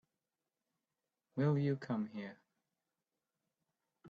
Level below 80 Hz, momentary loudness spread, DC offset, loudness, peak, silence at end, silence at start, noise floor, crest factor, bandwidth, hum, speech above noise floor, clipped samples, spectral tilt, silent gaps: -82 dBFS; 14 LU; under 0.1%; -38 LUFS; -22 dBFS; 0 s; 1.35 s; under -90 dBFS; 20 dB; 7 kHz; none; over 54 dB; under 0.1%; -9.5 dB/octave; none